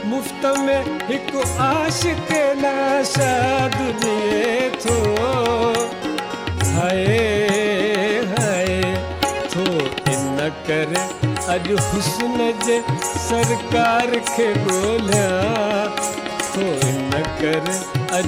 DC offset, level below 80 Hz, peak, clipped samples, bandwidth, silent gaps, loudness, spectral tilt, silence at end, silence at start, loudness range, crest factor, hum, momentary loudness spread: under 0.1%; -42 dBFS; -6 dBFS; under 0.1%; 17 kHz; none; -19 LUFS; -4.5 dB/octave; 0 s; 0 s; 2 LU; 14 dB; none; 5 LU